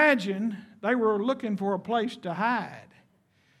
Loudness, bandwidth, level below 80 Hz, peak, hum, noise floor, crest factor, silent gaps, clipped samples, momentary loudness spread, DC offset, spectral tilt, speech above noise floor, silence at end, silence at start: -28 LUFS; 13 kHz; -80 dBFS; -8 dBFS; none; -66 dBFS; 20 dB; none; under 0.1%; 8 LU; under 0.1%; -6 dB/octave; 38 dB; 0.75 s; 0 s